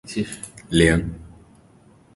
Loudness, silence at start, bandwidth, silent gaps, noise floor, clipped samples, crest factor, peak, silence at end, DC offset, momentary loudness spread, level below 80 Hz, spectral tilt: -21 LUFS; 0.05 s; 11.5 kHz; none; -53 dBFS; under 0.1%; 22 dB; -2 dBFS; 0.85 s; under 0.1%; 18 LU; -38 dBFS; -5 dB/octave